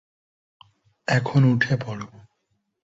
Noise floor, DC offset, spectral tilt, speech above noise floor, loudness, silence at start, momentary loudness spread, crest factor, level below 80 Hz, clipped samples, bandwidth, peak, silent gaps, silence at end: -73 dBFS; under 0.1%; -7 dB/octave; 52 dB; -22 LUFS; 1.1 s; 17 LU; 20 dB; -58 dBFS; under 0.1%; 7.8 kHz; -6 dBFS; none; 0.85 s